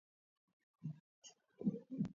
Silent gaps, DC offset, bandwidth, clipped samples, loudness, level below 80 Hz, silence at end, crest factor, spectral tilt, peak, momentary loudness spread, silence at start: 1.00-1.22 s; under 0.1%; 7.2 kHz; under 0.1%; -46 LUFS; -78 dBFS; 0.05 s; 22 dB; -9.5 dB/octave; -26 dBFS; 19 LU; 0.8 s